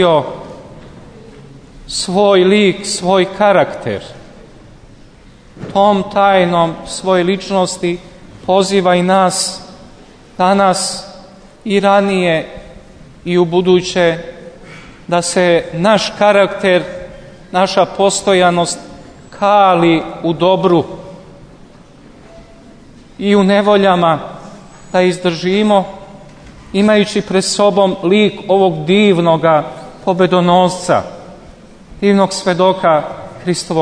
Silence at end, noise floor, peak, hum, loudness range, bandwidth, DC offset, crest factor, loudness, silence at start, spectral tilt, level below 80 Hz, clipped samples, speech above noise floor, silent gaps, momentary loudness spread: 0 s; -41 dBFS; 0 dBFS; none; 3 LU; 11 kHz; under 0.1%; 14 dB; -13 LUFS; 0 s; -5 dB/octave; -44 dBFS; under 0.1%; 29 dB; none; 17 LU